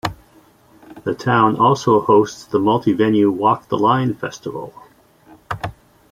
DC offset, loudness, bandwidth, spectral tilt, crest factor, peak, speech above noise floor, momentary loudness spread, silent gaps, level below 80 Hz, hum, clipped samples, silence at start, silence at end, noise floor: under 0.1%; -17 LUFS; 14.5 kHz; -6.5 dB/octave; 16 dB; -2 dBFS; 34 dB; 16 LU; none; -52 dBFS; none; under 0.1%; 0.05 s; 0.4 s; -51 dBFS